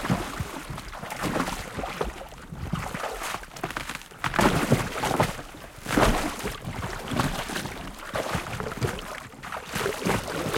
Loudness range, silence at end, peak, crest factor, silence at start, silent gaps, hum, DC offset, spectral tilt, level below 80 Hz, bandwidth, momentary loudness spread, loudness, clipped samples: 6 LU; 0 s; -6 dBFS; 22 dB; 0 s; none; none; under 0.1%; -4.5 dB/octave; -40 dBFS; 17 kHz; 13 LU; -29 LUFS; under 0.1%